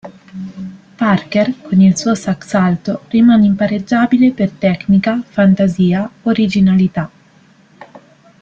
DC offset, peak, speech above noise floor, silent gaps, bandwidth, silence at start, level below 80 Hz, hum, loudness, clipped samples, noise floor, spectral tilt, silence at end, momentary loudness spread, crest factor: under 0.1%; -2 dBFS; 35 dB; none; 7.8 kHz; 0.05 s; -50 dBFS; none; -13 LUFS; under 0.1%; -48 dBFS; -7 dB/octave; 0.45 s; 17 LU; 12 dB